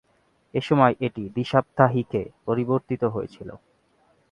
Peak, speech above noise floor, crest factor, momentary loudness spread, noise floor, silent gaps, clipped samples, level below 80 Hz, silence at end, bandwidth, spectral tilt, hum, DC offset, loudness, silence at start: -2 dBFS; 42 dB; 24 dB; 13 LU; -65 dBFS; none; under 0.1%; -58 dBFS; 0.75 s; 10 kHz; -8.5 dB/octave; none; under 0.1%; -24 LUFS; 0.55 s